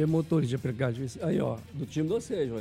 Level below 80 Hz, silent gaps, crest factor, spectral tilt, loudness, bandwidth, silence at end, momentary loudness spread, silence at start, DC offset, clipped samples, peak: -58 dBFS; none; 14 dB; -7.5 dB/octave; -30 LUFS; 14 kHz; 0 s; 6 LU; 0 s; under 0.1%; under 0.1%; -14 dBFS